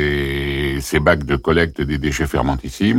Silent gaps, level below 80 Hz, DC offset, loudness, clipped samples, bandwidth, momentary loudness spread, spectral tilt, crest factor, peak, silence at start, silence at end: none; -30 dBFS; under 0.1%; -19 LUFS; under 0.1%; 16.5 kHz; 5 LU; -5.5 dB/octave; 14 dB; -4 dBFS; 0 s; 0 s